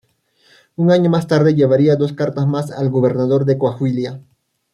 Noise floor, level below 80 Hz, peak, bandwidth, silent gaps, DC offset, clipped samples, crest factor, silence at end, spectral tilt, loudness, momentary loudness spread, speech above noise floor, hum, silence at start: -57 dBFS; -58 dBFS; -2 dBFS; 11 kHz; none; under 0.1%; under 0.1%; 14 dB; 0.55 s; -8.5 dB/octave; -16 LUFS; 8 LU; 42 dB; none; 0.8 s